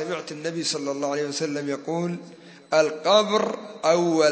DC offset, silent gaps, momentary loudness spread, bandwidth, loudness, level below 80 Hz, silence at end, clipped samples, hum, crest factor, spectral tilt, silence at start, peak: under 0.1%; none; 11 LU; 8 kHz; -24 LUFS; -78 dBFS; 0 s; under 0.1%; none; 20 dB; -4 dB/octave; 0 s; -4 dBFS